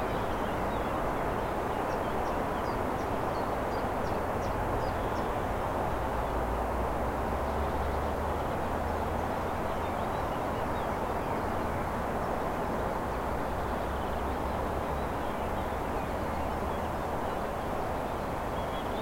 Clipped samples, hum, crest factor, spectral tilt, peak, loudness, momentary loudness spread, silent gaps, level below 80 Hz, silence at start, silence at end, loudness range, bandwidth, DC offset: under 0.1%; none; 14 dB; -6.5 dB/octave; -18 dBFS; -32 LUFS; 2 LU; none; -40 dBFS; 0 s; 0 s; 1 LU; 16.5 kHz; under 0.1%